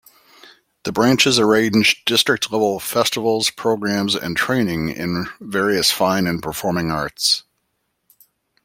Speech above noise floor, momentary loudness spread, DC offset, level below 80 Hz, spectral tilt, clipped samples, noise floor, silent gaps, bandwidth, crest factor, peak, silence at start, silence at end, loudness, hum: 53 dB; 9 LU; under 0.1%; -52 dBFS; -3.5 dB/octave; under 0.1%; -71 dBFS; none; 16.5 kHz; 18 dB; 0 dBFS; 0.85 s; 1.25 s; -18 LUFS; none